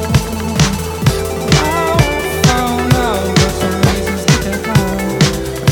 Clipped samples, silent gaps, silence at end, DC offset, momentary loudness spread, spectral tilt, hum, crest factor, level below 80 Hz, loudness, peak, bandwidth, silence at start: under 0.1%; none; 0 s; under 0.1%; 3 LU; -5 dB/octave; none; 14 dB; -26 dBFS; -14 LUFS; 0 dBFS; 19.5 kHz; 0 s